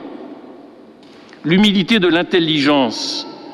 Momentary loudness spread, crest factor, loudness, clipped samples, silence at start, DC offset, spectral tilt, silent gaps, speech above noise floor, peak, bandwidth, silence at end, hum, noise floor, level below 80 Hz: 19 LU; 16 dB; -15 LUFS; under 0.1%; 0 s; under 0.1%; -5 dB/octave; none; 27 dB; -2 dBFS; 12 kHz; 0 s; none; -41 dBFS; -52 dBFS